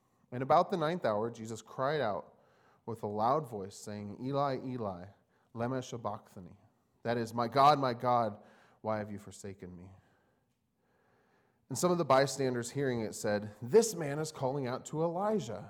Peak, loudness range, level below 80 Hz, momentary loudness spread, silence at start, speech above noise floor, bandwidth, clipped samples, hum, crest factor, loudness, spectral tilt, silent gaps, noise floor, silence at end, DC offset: -12 dBFS; 7 LU; -74 dBFS; 18 LU; 0.3 s; 44 dB; 19 kHz; under 0.1%; none; 22 dB; -33 LUFS; -5.5 dB/octave; none; -77 dBFS; 0 s; under 0.1%